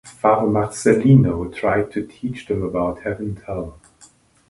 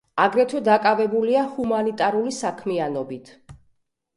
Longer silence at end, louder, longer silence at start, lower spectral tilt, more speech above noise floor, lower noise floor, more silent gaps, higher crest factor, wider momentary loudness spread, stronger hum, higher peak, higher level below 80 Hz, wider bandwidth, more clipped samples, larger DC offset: first, 0.75 s vs 0.6 s; about the same, -20 LUFS vs -21 LUFS; about the same, 0.05 s vs 0.15 s; first, -7.5 dB/octave vs -5 dB/octave; second, 33 dB vs 45 dB; second, -52 dBFS vs -66 dBFS; neither; about the same, 20 dB vs 18 dB; first, 15 LU vs 9 LU; neither; first, 0 dBFS vs -4 dBFS; first, -44 dBFS vs -62 dBFS; about the same, 11.5 kHz vs 11.5 kHz; neither; neither